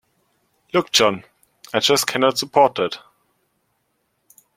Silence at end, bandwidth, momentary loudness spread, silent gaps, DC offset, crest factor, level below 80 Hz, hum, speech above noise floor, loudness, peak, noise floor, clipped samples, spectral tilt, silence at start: 1.6 s; 16.5 kHz; 9 LU; none; under 0.1%; 20 dB; -64 dBFS; none; 52 dB; -18 LUFS; -2 dBFS; -70 dBFS; under 0.1%; -2.5 dB/octave; 0.75 s